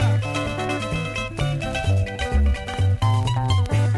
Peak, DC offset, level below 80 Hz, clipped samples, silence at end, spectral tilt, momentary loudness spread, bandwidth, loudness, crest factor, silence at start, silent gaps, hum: -10 dBFS; under 0.1%; -28 dBFS; under 0.1%; 0 s; -6 dB/octave; 5 LU; 11.5 kHz; -23 LUFS; 12 dB; 0 s; none; none